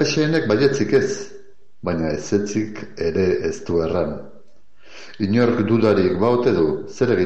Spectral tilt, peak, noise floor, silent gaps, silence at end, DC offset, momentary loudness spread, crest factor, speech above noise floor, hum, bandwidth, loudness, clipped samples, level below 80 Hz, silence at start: -6 dB/octave; -4 dBFS; -55 dBFS; none; 0 s; 1%; 10 LU; 16 dB; 36 dB; none; 8.2 kHz; -20 LUFS; under 0.1%; -48 dBFS; 0 s